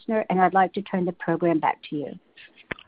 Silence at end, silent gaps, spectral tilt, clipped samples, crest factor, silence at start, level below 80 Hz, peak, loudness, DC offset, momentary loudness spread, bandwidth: 0.7 s; none; -11 dB/octave; under 0.1%; 18 dB; 0.1 s; -64 dBFS; -6 dBFS; -24 LUFS; under 0.1%; 16 LU; 4.8 kHz